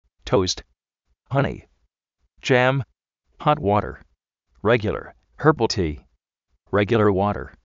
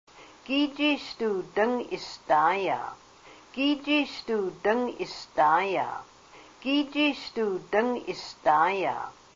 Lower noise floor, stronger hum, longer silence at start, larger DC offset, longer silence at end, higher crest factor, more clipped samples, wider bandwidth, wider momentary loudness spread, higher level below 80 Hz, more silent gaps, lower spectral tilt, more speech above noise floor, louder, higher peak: first, -73 dBFS vs -52 dBFS; neither; about the same, 0.25 s vs 0.15 s; neither; about the same, 0.2 s vs 0.25 s; about the same, 22 dB vs 20 dB; neither; about the same, 7.6 kHz vs 7.6 kHz; about the same, 13 LU vs 13 LU; first, -46 dBFS vs -66 dBFS; neither; about the same, -5 dB/octave vs -4.5 dB/octave; first, 52 dB vs 25 dB; first, -22 LUFS vs -27 LUFS; first, -2 dBFS vs -8 dBFS